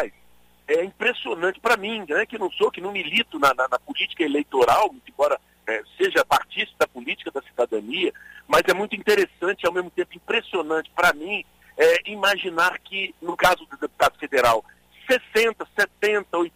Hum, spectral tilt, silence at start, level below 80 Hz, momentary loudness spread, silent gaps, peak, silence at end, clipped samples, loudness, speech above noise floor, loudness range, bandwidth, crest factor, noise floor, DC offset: none; -3 dB/octave; 0 s; -56 dBFS; 9 LU; none; -6 dBFS; 0.05 s; under 0.1%; -22 LUFS; 35 dB; 2 LU; 16 kHz; 16 dB; -58 dBFS; under 0.1%